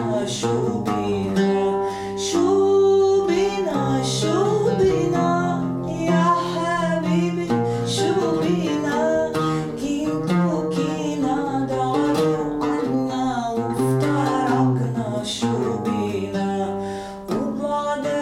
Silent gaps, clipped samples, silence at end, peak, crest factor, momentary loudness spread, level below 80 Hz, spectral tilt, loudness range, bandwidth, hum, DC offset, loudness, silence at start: none; under 0.1%; 0 s; -8 dBFS; 14 dB; 6 LU; -50 dBFS; -6 dB/octave; 3 LU; 14.5 kHz; none; under 0.1%; -21 LUFS; 0 s